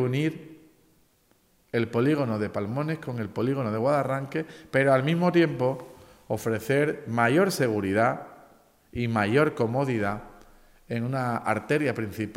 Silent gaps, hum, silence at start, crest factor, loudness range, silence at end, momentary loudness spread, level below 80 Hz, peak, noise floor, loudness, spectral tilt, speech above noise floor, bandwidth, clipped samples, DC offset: none; none; 0 s; 18 dB; 4 LU; 0.05 s; 11 LU; -60 dBFS; -8 dBFS; -65 dBFS; -26 LUFS; -6.5 dB/octave; 39 dB; 16 kHz; under 0.1%; under 0.1%